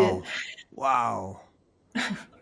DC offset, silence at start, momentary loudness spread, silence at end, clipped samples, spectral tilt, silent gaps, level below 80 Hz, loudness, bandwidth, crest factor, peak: under 0.1%; 0 s; 14 LU; 0.15 s; under 0.1%; -4.5 dB/octave; none; -66 dBFS; -29 LUFS; 10.5 kHz; 20 dB; -10 dBFS